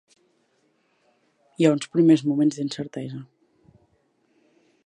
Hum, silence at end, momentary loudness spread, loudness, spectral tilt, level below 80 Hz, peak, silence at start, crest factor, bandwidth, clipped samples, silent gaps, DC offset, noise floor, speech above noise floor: none; 1.6 s; 17 LU; -22 LUFS; -6.5 dB/octave; -74 dBFS; -4 dBFS; 1.6 s; 22 dB; 10.5 kHz; under 0.1%; none; under 0.1%; -67 dBFS; 46 dB